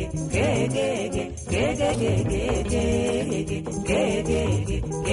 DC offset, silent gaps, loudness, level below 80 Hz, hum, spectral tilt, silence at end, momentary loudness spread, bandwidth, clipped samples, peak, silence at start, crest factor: under 0.1%; none; -25 LUFS; -34 dBFS; none; -5.5 dB/octave; 0 s; 5 LU; 11.5 kHz; under 0.1%; -12 dBFS; 0 s; 12 dB